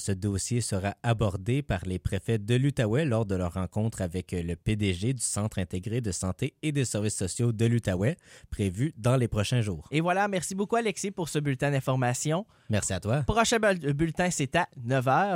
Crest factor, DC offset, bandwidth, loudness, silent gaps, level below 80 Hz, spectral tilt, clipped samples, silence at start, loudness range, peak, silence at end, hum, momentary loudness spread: 18 dB; under 0.1%; 16.5 kHz; -28 LUFS; none; -48 dBFS; -5.5 dB/octave; under 0.1%; 0 s; 3 LU; -10 dBFS; 0 s; none; 6 LU